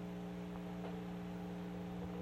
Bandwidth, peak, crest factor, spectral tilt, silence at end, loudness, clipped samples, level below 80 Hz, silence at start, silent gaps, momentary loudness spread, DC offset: 14.5 kHz; -34 dBFS; 10 dB; -7.5 dB/octave; 0 s; -46 LUFS; under 0.1%; -62 dBFS; 0 s; none; 1 LU; under 0.1%